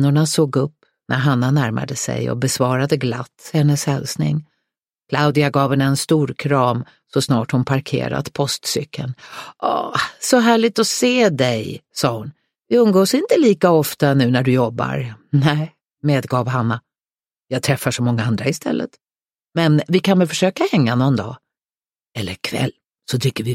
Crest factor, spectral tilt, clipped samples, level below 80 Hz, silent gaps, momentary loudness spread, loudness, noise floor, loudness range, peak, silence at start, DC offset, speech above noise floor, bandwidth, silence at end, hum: 18 dB; -5.5 dB/octave; under 0.1%; -56 dBFS; none; 11 LU; -18 LUFS; under -90 dBFS; 5 LU; 0 dBFS; 0 s; under 0.1%; over 73 dB; 16.5 kHz; 0 s; none